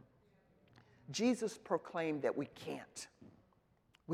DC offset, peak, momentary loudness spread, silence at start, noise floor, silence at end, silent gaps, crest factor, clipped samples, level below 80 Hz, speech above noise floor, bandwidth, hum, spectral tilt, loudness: under 0.1%; -20 dBFS; 17 LU; 1.1 s; -73 dBFS; 0 s; none; 22 dB; under 0.1%; -80 dBFS; 34 dB; 14.5 kHz; none; -4.5 dB/octave; -40 LUFS